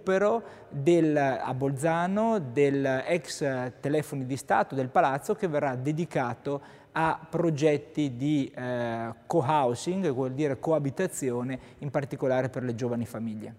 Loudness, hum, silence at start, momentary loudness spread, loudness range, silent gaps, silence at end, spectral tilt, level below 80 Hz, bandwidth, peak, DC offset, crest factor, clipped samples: -28 LUFS; none; 0 s; 8 LU; 3 LU; none; 0 s; -6.5 dB/octave; -64 dBFS; 16 kHz; -10 dBFS; under 0.1%; 18 dB; under 0.1%